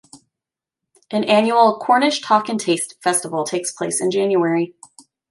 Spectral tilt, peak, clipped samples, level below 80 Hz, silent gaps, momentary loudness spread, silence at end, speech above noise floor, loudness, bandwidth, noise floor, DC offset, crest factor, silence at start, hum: -3.5 dB/octave; -2 dBFS; under 0.1%; -72 dBFS; none; 8 LU; 0.6 s; 69 dB; -18 LUFS; 12 kHz; -87 dBFS; under 0.1%; 18 dB; 0.15 s; none